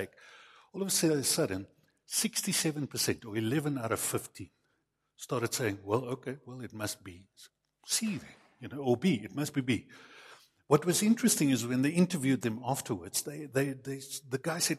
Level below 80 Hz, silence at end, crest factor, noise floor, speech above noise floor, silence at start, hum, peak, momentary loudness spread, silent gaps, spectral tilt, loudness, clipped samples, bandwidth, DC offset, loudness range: -70 dBFS; 0 s; 22 dB; -79 dBFS; 47 dB; 0 s; none; -10 dBFS; 16 LU; none; -4 dB/octave; -31 LUFS; under 0.1%; 15.5 kHz; under 0.1%; 7 LU